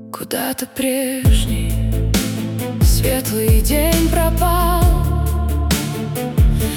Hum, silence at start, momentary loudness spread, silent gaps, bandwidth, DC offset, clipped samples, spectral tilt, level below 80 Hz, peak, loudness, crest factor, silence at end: none; 0 s; 7 LU; none; 18 kHz; under 0.1%; under 0.1%; -5.5 dB/octave; -20 dBFS; -2 dBFS; -17 LUFS; 12 dB; 0 s